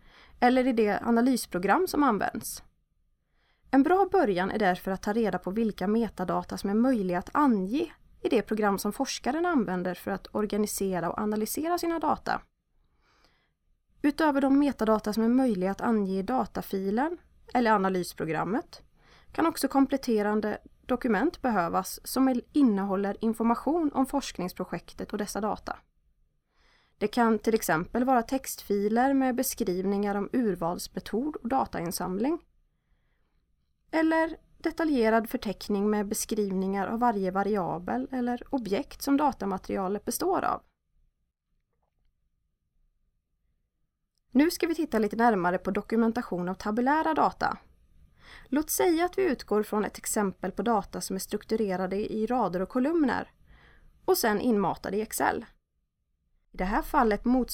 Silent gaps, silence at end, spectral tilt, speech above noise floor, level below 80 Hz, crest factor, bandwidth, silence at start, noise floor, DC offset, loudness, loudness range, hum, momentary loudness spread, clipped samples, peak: none; 0 s; -5 dB/octave; 51 dB; -52 dBFS; 18 dB; 17.5 kHz; 0.4 s; -78 dBFS; under 0.1%; -28 LUFS; 4 LU; none; 8 LU; under 0.1%; -10 dBFS